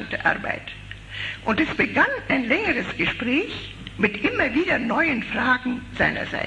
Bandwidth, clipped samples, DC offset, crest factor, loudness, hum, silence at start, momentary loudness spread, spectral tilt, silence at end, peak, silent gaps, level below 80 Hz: 10.5 kHz; under 0.1%; under 0.1%; 20 dB; -22 LUFS; none; 0 s; 11 LU; -5.5 dB/octave; 0 s; -4 dBFS; none; -46 dBFS